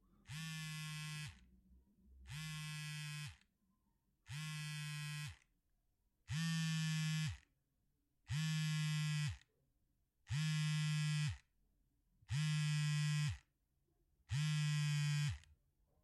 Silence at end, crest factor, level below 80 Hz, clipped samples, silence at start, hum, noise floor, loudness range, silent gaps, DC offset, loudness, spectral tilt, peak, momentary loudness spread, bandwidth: 0.65 s; 12 dB; -68 dBFS; under 0.1%; 0.3 s; none; -83 dBFS; 9 LU; none; under 0.1%; -42 LUFS; -4 dB/octave; -30 dBFS; 12 LU; 13.5 kHz